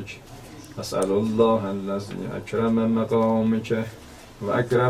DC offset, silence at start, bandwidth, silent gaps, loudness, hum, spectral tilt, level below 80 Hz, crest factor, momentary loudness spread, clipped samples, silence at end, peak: under 0.1%; 0 s; 14.5 kHz; none; -24 LUFS; none; -7 dB/octave; -52 dBFS; 16 dB; 19 LU; under 0.1%; 0 s; -8 dBFS